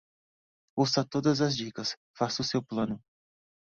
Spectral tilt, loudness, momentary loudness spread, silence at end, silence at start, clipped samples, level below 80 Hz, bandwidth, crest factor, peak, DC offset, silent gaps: -5 dB/octave; -30 LUFS; 8 LU; 0.8 s; 0.75 s; under 0.1%; -64 dBFS; 7.8 kHz; 18 dB; -14 dBFS; under 0.1%; 1.97-2.14 s